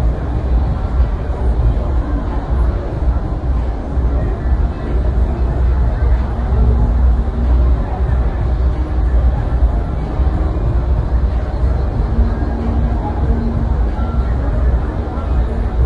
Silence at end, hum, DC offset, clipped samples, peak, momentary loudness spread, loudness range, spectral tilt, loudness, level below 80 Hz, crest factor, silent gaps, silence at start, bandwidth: 0 s; none; under 0.1%; under 0.1%; -2 dBFS; 4 LU; 2 LU; -9.5 dB/octave; -18 LUFS; -16 dBFS; 12 dB; none; 0 s; 4.5 kHz